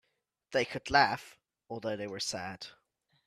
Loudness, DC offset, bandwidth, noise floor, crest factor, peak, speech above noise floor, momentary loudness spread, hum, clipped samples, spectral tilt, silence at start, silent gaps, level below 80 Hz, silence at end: -32 LUFS; under 0.1%; 14.5 kHz; -80 dBFS; 24 dB; -10 dBFS; 48 dB; 18 LU; none; under 0.1%; -3 dB/octave; 0.5 s; none; -64 dBFS; 0.55 s